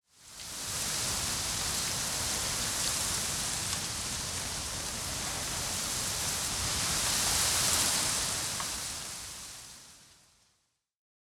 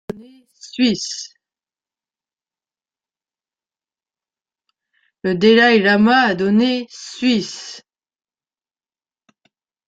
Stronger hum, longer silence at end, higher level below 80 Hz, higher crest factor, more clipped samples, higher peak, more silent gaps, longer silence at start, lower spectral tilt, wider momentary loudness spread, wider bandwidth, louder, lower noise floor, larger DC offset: neither; second, 1.25 s vs 2.1 s; first, -50 dBFS vs -62 dBFS; about the same, 20 dB vs 20 dB; neither; second, -12 dBFS vs -2 dBFS; neither; about the same, 0.2 s vs 0.15 s; second, -1 dB/octave vs -4.5 dB/octave; second, 13 LU vs 22 LU; first, 17.5 kHz vs 9 kHz; second, -30 LUFS vs -15 LUFS; second, -76 dBFS vs under -90 dBFS; neither